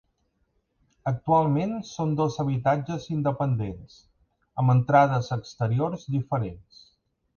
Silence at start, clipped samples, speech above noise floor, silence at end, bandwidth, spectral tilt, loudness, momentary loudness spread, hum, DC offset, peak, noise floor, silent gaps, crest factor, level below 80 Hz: 1.05 s; under 0.1%; 47 dB; 0.8 s; 7 kHz; -8 dB/octave; -25 LUFS; 12 LU; none; under 0.1%; -6 dBFS; -72 dBFS; none; 20 dB; -54 dBFS